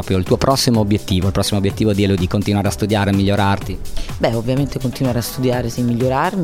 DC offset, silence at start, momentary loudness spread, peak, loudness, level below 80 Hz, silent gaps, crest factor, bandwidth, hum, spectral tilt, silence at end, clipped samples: under 0.1%; 0 s; 5 LU; 0 dBFS; -17 LUFS; -32 dBFS; none; 16 dB; 16.5 kHz; none; -6 dB/octave; 0 s; under 0.1%